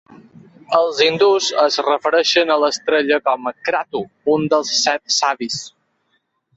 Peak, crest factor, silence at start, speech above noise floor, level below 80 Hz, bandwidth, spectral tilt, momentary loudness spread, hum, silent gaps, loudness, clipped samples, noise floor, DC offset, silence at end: -2 dBFS; 16 dB; 0.7 s; 50 dB; -64 dBFS; 8.2 kHz; -2.5 dB/octave; 8 LU; none; none; -17 LUFS; under 0.1%; -67 dBFS; under 0.1%; 0.9 s